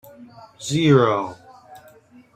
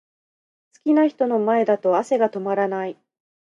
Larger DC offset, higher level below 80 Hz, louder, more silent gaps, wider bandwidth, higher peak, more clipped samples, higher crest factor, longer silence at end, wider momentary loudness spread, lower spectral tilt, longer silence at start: neither; first, -60 dBFS vs -78 dBFS; first, -18 LUFS vs -21 LUFS; neither; first, 14 kHz vs 9.6 kHz; first, -2 dBFS vs -6 dBFS; neither; about the same, 20 dB vs 16 dB; about the same, 0.6 s vs 0.65 s; first, 17 LU vs 9 LU; about the same, -6 dB/octave vs -7 dB/octave; second, 0.2 s vs 0.85 s